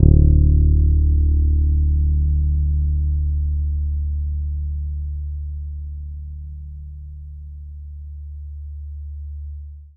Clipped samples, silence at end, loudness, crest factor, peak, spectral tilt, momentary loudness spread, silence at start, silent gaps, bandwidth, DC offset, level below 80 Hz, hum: under 0.1%; 0.1 s; -20 LUFS; 18 dB; 0 dBFS; -16 dB/octave; 20 LU; 0 s; none; 0.7 kHz; under 0.1%; -20 dBFS; none